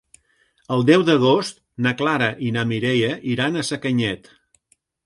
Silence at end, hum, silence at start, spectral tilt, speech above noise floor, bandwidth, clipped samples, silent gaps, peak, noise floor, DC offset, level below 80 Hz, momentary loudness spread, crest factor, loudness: 0.9 s; none; 0.7 s; -5.5 dB/octave; 45 dB; 11.5 kHz; under 0.1%; none; -2 dBFS; -65 dBFS; under 0.1%; -58 dBFS; 9 LU; 18 dB; -20 LUFS